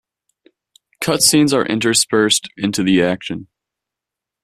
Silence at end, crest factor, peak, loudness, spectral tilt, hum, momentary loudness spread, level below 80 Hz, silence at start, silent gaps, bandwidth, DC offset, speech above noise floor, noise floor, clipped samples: 1 s; 18 dB; 0 dBFS; -15 LUFS; -3 dB/octave; none; 12 LU; -56 dBFS; 1 s; none; 15 kHz; under 0.1%; 69 dB; -85 dBFS; under 0.1%